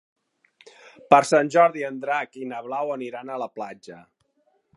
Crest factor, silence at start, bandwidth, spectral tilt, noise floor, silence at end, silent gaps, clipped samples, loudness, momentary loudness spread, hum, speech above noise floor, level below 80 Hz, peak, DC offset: 24 dB; 1.1 s; 11.5 kHz; -4.5 dB/octave; -68 dBFS; 0.75 s; none; under 0.1%; -22 LUFS; 17 LU; none; 45 dB; -74 dBFS; 0 dBFS; under 0.1%